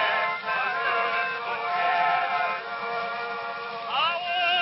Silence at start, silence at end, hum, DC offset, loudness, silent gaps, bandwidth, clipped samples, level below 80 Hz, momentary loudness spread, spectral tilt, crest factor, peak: 0 s; 0 s; none; under 0.1%; -26 LUFS; none; 5.8 kHz; under 0.1%; -72 dBFS; 8 LU; -5.5 dB/octave; 14 dB; -12 dBFS